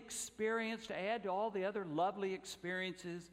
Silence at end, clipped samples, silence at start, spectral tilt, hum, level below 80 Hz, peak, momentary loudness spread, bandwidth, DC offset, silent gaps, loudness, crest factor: 0 s; under 0.1%; 0 s; -4 dB/octave; none; -76 dBFS; -24 dBFS; 6 LU; 16 kHz; under 0.1%; none; -40 LUFS; 16 dB